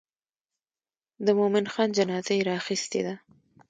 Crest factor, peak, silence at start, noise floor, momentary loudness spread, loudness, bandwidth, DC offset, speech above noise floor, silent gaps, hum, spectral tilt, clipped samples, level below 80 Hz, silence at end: 18 dB; -10 dBFS; 1.2 s; under -90 dBFS; 7 LU; -26 LUFS; 9.4 kHz; under 0.1%; over 64 dB; none; none; -4.5 dB/octave; under 0.1%; -74 dBFS; 0.5 s